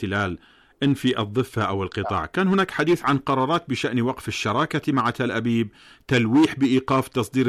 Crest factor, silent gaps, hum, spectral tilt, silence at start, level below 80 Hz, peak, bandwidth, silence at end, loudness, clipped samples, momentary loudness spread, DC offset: 12 dB; none; none; -6 dB/octave; 0 s; -54 dBFS; -12 dBFS; 14.5 kHz; 0 s; -23 LUFS; under 0.1%; 6 LU; under 0.1%